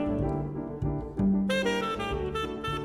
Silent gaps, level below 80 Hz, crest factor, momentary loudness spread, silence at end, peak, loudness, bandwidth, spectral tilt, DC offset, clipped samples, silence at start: none; -42 dBFS; 14 dB; 7 LU; 0 s; -16 dBFS; -30 LUFS; 13 kHz; -6.5 dB/octave; under 0.1%; under 0.1%; 0 s